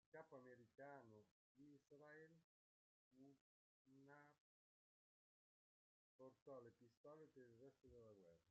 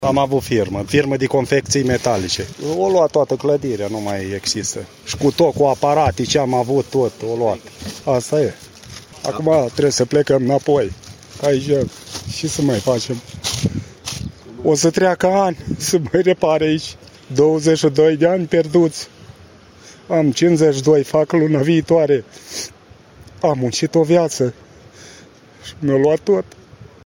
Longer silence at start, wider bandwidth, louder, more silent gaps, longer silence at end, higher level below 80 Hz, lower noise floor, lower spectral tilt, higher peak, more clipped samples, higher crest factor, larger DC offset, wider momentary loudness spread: first, 0.15 s vs 0 s; second, 7 kHz vs 16.5 kHz; second, -66 LUFS vs -17 LUFS; first, 1.31-1.55 s, 2.44-3.11 s, 3.41-3.85 s, 4.40-6.19 s, 6.42-6.46 s, 6.97-7.04 s vs none; second, 0 s vs 0.2 s; second, under -90 dBFS vs -46 dBFS; first, under -90 dBFS vs -44 dBFS; about the same, -6 dB/octave vs -5 dB/octave; second, -48 dBFS vs -4 dBFS; neither; first, 20 dB vs 14 dB; neither; second, 6 LU vs 13 LU